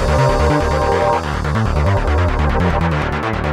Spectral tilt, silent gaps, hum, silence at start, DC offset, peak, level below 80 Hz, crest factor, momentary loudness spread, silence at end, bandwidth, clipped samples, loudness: -6.5 dB/octave; none; none; 0 s; 0.2%; -2 dBFS; -22 dBFS; 12 dB; 4 LU; 0 s; 12 kHz; under 0.1%; -16 LUFS